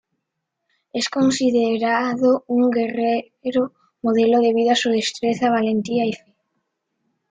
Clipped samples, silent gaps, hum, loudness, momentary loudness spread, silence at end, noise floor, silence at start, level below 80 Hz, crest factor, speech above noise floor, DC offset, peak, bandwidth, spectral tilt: under 0.1%; none; none; -20 LUFS; 8 LU; 1.15 s; -78 dBFS; 0.95 s; -64 dBFS; 14 dB; 60 dB; under 0.1%; -6 dBFS; 9.4 kHz; -4.5 dB/octave